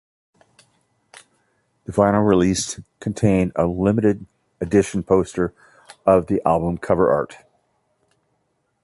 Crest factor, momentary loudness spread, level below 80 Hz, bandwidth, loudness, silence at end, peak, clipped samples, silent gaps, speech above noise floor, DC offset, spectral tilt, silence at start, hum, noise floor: 18 dB; 12 LU; -44 dBFS; 11.5 kHz; -20 LUFS; 1.5 s; -2 dBFS; under 0.1%; none; 51 dB; under 0.1%; -6.5 dB/octave; 1.9 s; none; -70 dBFS